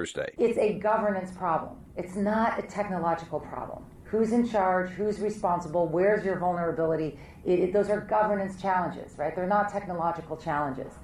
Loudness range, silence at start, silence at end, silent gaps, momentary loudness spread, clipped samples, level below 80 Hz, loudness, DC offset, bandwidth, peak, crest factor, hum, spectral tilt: 3 LU; 0 s; 0 s; none; 10 LU; under 0.1%; -54 dBFS; -28 LUFS; under 0.1%; 12.5 kHz; -14 dBFS; 14 dB; none; -7 dB/octave